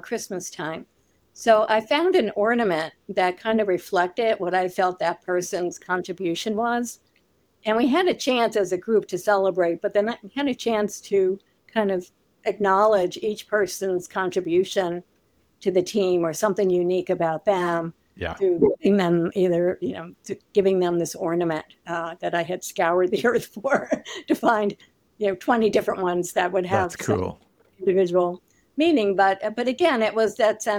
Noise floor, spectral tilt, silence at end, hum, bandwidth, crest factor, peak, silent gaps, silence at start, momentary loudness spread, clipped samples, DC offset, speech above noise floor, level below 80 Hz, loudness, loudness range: -65 dBFS; -5 dB/octave; 0 s; none; 17.5 kHz; 18 dB; -6 dBFS; none; 0.05 s; 10 LU; under 0.1%; under 0.1%; 42 dB; -60 dBFS; -23 LUFS; 2 LU